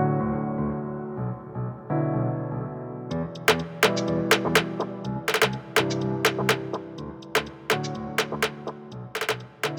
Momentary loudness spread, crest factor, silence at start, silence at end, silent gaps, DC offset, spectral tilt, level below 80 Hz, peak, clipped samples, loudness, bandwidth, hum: 12 LU; 20 dB; 0 s; 0 s; none; under 0.1%; -4.5 dB/octave; -54 dBFS; -6 dBFS; under 0.1%; -26 LUFS; over 20 kHz; none